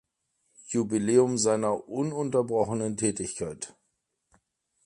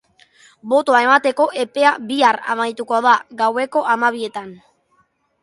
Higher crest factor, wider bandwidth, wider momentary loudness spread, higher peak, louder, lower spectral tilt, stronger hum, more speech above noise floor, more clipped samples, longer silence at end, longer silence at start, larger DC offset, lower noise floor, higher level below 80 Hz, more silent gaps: about the same, 20 dB vs 16 dB; about the same, 11 kHz vs 11.5 kHz; about the same, 12 LU vs 12 LU; second, -10 dBFS vs -2 dBFS; second, -27 LUFS vs -17 LUFS; first, -5 dB/octave vs -3 dB/octave; neither; first, 52 dB vs 45 dB; neither; first, 1.2 s vs 0.85 s; about the same, 0.65 s vs 0.65 s; neither; first, -78 dBFS vs -62 dBFS; first, -62 dBFS vs -70 dBFS; neither